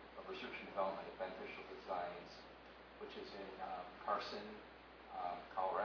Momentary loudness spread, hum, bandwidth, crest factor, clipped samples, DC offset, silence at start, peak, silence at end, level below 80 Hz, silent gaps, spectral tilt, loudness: 14 LU; none; 5.4 kHz; 20 dB; under 0.1%; under 0.1%; 0 s; -28 dBFS; 0 s; -72 dBFS; none; -2 dB/octave; -47 LUFS